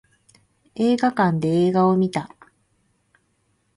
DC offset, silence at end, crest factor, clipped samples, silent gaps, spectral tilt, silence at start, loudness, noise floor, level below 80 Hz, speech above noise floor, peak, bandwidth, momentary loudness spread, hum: under 0.1%; 1.5 s; 16 dB; under 0.1%; none; -7.5 dB/octave; 0.75 s; -20 LUFS; -67 dBFS; -62 dBFS; 48 dB; -6 dBFS; 11.5 kHz; 14 LU; none